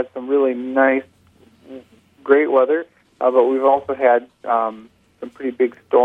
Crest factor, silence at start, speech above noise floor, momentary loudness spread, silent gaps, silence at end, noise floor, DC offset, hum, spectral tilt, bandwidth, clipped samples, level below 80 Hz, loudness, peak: 18 dB; 0 s; 36 dB; 13 LU; none; 0 s; -53 dBFS; under 0.1%; none; -7 dB/octave; 3.9 kHz; under 0.1%; -68 dBFS; -18 LUFS; 0 dBFS